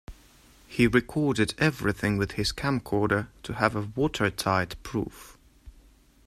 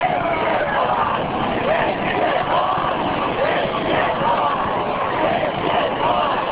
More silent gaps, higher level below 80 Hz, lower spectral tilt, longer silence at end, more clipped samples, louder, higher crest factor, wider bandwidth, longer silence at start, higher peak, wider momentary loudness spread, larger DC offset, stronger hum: neither; about the same, -48 dBFS vs -44 dBFS; second, -5.5 dB/octave vs -9 dB/octave; first, 0.55 s vs 0 s; neither; second, -27 LUFS vs -19 LUFS; first, 22 dB vs 14 dB; first, 15.5 kHz vs 4 kHz; about the same, 0.1 s vs 0 s; about the same, -6 dBFS vs -6 dBFS; first, 9 LU vs 2 LU; neither; neither